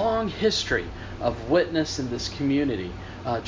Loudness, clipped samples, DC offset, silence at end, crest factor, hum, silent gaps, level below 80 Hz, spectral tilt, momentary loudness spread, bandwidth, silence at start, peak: -26 LUFS; under 0.1%; under 0.1%; 0 s; 16 dB; none; none; -42 dBFS; -5 dB/octave; 9 LU; 7.6 kHz; 0 s; -8 dBFS